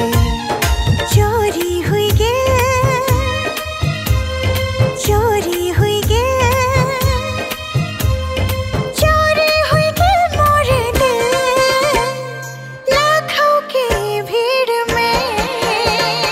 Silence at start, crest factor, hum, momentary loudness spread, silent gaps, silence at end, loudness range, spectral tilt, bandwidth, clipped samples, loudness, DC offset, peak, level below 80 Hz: 0 s; 12 dB; none; 6 LU; none; 0 s; 3 LU; -4.5 dB/octave; 16.5 kHz; under 0.1%; -15 LUFS; under 0.1%; -2 dBFS; -26 dBFS